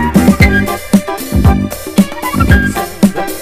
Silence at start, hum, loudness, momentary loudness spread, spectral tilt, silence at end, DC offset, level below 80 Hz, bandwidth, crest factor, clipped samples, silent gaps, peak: 0 s; none; -11 LUFS; 6 LU; -6 dB/octave; 0 s; under 0.1%; -20 dBFS; 16 kHz; 10 dB; 2%; none; 0 dBFS